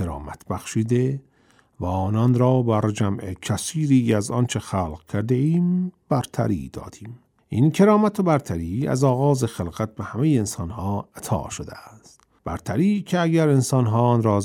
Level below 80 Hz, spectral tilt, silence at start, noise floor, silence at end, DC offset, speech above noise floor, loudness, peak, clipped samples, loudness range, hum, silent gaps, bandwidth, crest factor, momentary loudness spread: -48 dBFS; -7 dB/octave; 0 s; -59 dBFS; 0 s; under 0.1%; 38 dB; -22 LUFS; -6 dBFS; under 0.1%; 4 LU; none; none; 15.5 kHz; 16 dB; 13 LU